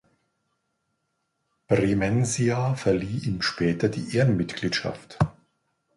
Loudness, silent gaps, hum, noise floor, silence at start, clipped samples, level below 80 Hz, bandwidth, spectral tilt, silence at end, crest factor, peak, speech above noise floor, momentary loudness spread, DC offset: -25 LUFS; none; none; -77 dBFS; 1.7 s; under 0.1%; -50 dBFS; 11.5 kHz; -5.5 dB/octave; 0.65 s; 18 dB; -8 dBFS; 53 dB; 5 LU; under 0.1%